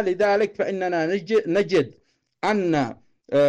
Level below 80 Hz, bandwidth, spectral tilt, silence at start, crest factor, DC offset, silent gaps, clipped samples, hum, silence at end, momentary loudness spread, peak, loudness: -62 dBFS; 9.6 kHz; -6 dB/octave; 0 s; 10 dB; under 0.1%; none; under 0.1%; none; 0 s; 6 LU; -12 dBFS; -23 LUFS